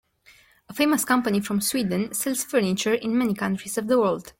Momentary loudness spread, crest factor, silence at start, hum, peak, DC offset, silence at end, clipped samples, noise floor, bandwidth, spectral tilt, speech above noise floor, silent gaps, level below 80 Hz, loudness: 4 LU; 16 dB; 0.7 s; none; -8 dBFS; under 0.1%; 0.1 s; under 0.1%; -56 dBFS; 17 kHz; -4 dB/octave; 33 dB; none; -62 dBFS; -23 LUFS